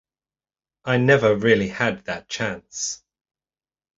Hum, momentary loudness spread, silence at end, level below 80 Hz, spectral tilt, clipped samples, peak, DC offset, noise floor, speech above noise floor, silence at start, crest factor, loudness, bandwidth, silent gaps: none; 13 LU; 1 s; -56 dBFS; -4.5 dB/octave; under 0.1%; -4 dBFS; under 0.1%; under -90 dBFS; over 69 dB; 0.85 s; 20 dB; -21 LUFS; 8 kHz; none